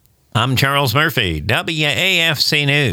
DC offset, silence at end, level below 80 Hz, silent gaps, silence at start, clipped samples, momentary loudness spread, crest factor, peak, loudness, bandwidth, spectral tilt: under 0.1%; 0 s; -40 dBFS; none; 0.35 s; under 0.1%; 5 LU; 14 dB; -2 dBFS; -15 LUFS; 19.5 kHz; -4 dB/octave